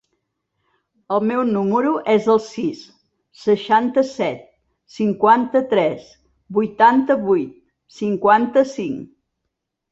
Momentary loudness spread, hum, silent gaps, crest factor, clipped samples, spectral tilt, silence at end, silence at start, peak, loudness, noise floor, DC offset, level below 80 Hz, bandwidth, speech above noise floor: 12 LU; none; none; 18 dB; under 0.1%; -6.5 dB/octave; 0.85 s; 1.1 s; -2 dBFS; -18 LUFS; -78 dBFS; under 0.1%; -62 dBFS; 8 kHz; 60 dB